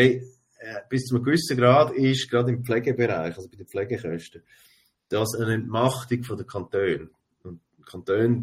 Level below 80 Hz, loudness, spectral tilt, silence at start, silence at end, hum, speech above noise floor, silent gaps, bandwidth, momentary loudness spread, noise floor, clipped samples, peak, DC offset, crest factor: -60 dBFS; -24 LUFS; -6 dB/octave; 0 s; 0 s; none; 20 dB; none; 16 kHz; 18 LU; -44 dBFS; under 0.1%; -4 dBFS; under 0.1%; 20 dB